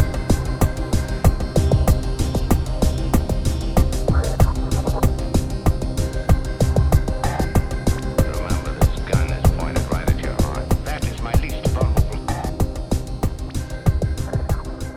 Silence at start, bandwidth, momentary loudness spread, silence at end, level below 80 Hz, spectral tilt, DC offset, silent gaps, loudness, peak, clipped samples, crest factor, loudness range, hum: 0 s; 17.5 kHz; 6 LU; 0 s; -22 dBFS; -6.5 dB/octave; under 0.1%; none; -22 LUFS; -2 dBFS; under 0.1%; 18 dB; 3 LU; none